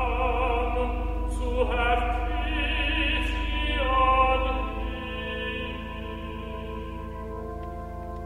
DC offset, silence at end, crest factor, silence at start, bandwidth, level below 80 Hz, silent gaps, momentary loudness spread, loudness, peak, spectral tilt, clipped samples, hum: 0.2%; 0 s; 18 dB; 0 s; 10.5 kHz; -30 dBFS; none; 13 LU; -28 LUFS; -10 dBFS; -6 dB/octave; under 0.1%; none